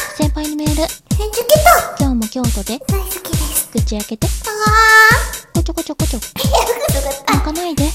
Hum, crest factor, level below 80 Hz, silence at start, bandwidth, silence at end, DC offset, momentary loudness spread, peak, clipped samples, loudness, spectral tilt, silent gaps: none; 14 dB; -24 dBFS; 0 s; 17 kHz; 0 s; under 0.1%; 11 LU; 0 dBFS; 0.1%; -14 LUFS; -4 dB/octave; none